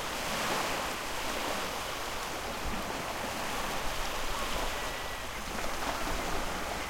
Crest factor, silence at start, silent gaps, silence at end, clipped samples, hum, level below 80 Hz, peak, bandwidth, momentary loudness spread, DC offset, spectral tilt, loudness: 16 dB; 0 s; none; 0 s; under 0.1%; none; -44 dBFS; -18 dBFS; 16.5 kHz; 4 LU; under 0.1%; -2.5 dB/octave; -34 LUFS